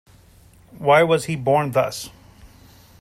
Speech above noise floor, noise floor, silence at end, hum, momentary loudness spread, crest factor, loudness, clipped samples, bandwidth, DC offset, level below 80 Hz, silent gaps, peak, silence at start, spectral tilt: 32 dB; -50 dBFS; 0.55 s; none; 14 LU; 18 dB; -19 LUFS; under 0.1%; 16 kHz; under 0.1%; -54 dBFS; none; -4 dBFS; 0.75 s; -5 dB/octave